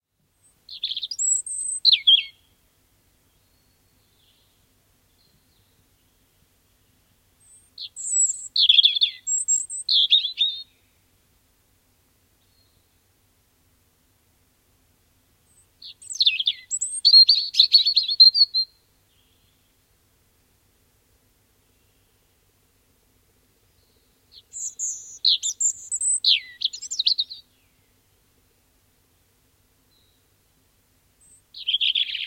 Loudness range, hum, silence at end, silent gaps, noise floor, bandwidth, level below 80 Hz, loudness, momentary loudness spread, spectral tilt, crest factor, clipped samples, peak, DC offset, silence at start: 14 LU; 50 Hz at -70 dBFS; 0 s; none; -64 dBFS; 16.5 kHz; -70 dBFS; -18 LUFS; 19 LU; 5 dB/octave; 24 dB; under 0.1%; -2 dBFS; under 0.1%; 0.7 s